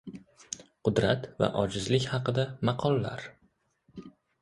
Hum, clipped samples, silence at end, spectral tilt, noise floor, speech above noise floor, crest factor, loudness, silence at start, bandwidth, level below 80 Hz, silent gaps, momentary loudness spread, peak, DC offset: none; under 0.1%; 0.35 s; -5.5 dB/octave; -70 dBFS; 42 dB; 22 dB; -29 LUFS; 0.05 s; 11.5 kHz; -56 dBFS; none; 21 LU; -10 dBFS; under 0.1%